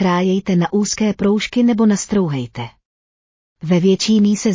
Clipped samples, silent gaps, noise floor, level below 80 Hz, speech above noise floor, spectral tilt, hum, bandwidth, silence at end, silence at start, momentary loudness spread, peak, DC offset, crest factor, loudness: under 0.1%; 2.85-3.56 s; under -90 dBFS; -50 dBFS; over 74 dB; -5.5 dB/octave; none; 7.6 kHz; 0 s; 0 s; 12 LU; -4 dBFS; under 0.1%; 12 dB; -16 LUFS